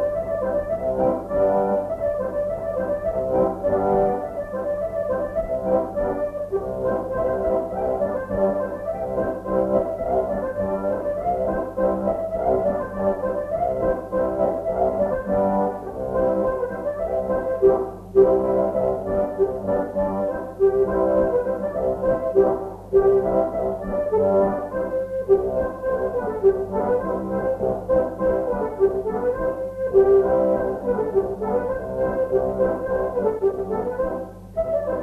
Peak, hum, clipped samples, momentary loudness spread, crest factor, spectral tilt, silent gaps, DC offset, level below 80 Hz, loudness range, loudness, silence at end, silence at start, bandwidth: -4 dBFS; none; under 0.1%; 7 LU; 18 dB; -9.5 dB/octave; none; under 0.1%; -42 dBFS; 3 LU; -23 LUFS; 0 s; 0 s; 3.5 kHz